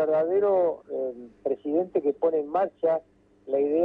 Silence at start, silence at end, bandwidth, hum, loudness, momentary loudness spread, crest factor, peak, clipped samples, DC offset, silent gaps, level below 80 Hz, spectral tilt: 0 s; 0 s; 4.1 kHz; none; -26 LUFS; 9 LU; 12 dB; -12 dBFS; under 0.1%; under 0.1%; none; -70 dBFS; -9.5 dB/octave